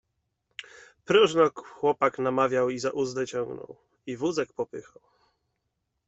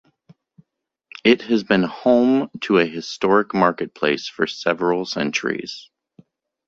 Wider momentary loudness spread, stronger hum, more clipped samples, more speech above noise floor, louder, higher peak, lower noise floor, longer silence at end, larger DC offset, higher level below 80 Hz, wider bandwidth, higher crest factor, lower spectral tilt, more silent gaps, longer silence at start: first, 21 LU vs 7 LU; neither; neither; about the same, 53 dB vs 56 dB; second, -26 LUFS vs -20 LUFS; second, -8 dBFS vs -2 dBFS; first, -80 dBFS vs -75 dBFS; first, 1.25 s vs 0.85 s; neither; second, -68 dBFS vs -60 dBFS; about the same, 8.2 kHz vs 7.8 kHz; about the same, 20 dB vs 20 dB; about the same, -4.5 dB/octave vs -5 dB/octave; neither; second, 0.6 s vs 1.25 s